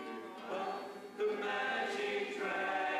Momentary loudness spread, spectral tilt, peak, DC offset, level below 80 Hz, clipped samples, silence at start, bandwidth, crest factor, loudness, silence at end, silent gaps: 10 LU; -3.5 dB/octave; -26 dBFS; under 0.1%; -80 dBFS; under 0.1%; 0 s; 15 kHz; 12 dB; -38 LUFS; 0 s; none